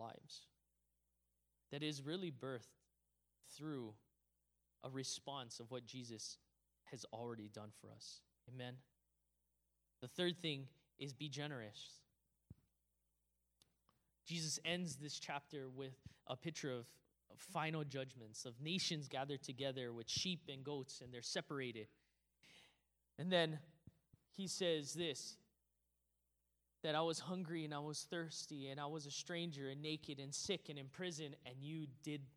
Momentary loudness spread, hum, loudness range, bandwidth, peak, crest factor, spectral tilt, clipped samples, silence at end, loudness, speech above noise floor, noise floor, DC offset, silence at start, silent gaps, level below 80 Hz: 17 LU; 60 Hz at -75 dBFS; 8 LU; over 20 kHz; -22 dBFS; 26 dB; -4 dB/octave; under 0.1%; 0.05 s; -47 LUFS; 38 dB; -85 dBFS; under 0.1%; 0 s; none; -86 dBFS